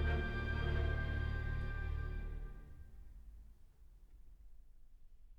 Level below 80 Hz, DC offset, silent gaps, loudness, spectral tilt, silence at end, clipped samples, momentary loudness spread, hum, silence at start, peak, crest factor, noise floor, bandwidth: -42 dBFS; under 0.1%; none; -41 LUFS; -7.5 dB/octave; 0 s; under 0.1%; 22 LU; none; 0 s; -26 dBFS; 16 dB; -60 dBFS; 5.4 kHz